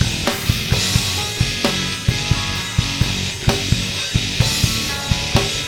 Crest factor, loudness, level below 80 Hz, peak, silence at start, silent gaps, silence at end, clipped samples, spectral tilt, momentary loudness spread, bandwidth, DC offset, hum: 18 dB; -18 LUFS; -30 dBFS; 0 dBFS; 0 s; none; 0 s; under 0.1%; -3.5 dB/octave; 3 LU; 20 kHz; under 0.1%; none